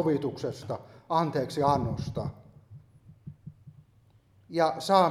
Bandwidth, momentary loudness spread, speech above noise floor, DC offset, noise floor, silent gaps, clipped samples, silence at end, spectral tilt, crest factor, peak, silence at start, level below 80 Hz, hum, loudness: 15.5 kHz; 23 LU; 34 dB; under 0.1%; -62 dBFS; none; under 0.1%; 0 s; -6.5 dB/octave; 22 dB; -8 dBFS; 0 s; -56 dBFS; none; -29 LUFS